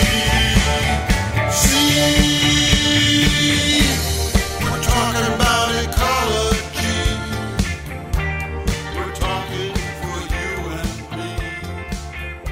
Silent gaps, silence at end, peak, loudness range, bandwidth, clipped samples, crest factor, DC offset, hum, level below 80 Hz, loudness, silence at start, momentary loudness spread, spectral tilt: none; 0 s; -2 dBFS; 10 LU; 16.5 kHz; under 0.1%; 18 dB; under 0.1%; none; -26 dBFS; -18 LUFS; 0 s; 13 LU; -3.5 dB/octave